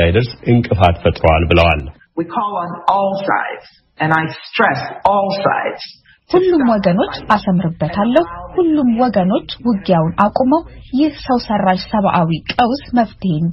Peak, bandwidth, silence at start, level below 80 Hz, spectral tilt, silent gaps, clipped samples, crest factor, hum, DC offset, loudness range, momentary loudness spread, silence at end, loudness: 0 dBFS; 6.2 kHz; 0 s; -34 dBFS; -5 dB/octave; none; under 0.1%; 14 dB; none; under 0.1%; 2 LU; 7 LU; 0 s; -15 LUFS